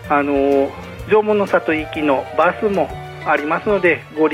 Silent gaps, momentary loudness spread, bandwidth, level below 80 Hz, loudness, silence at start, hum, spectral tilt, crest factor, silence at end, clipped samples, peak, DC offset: none; 6 LU; 13.5 kHz; -44 dBFS; -17 LUFS; 0 s; none; -6.5 dB/octave; 14 dB; 0 s; under 0.1%; -4 dBFS; under 0.1%